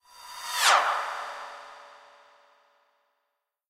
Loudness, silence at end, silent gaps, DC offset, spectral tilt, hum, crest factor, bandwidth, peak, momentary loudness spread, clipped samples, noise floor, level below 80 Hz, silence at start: -25 LUFS; 1.75 s; none; under 0.1%; 3 dB/octave; none; 24 dB; 16 kHz; -6 dBFS; 25 LU; under 0.1%; -81 dBFS; -78 dBFS; 0.2 s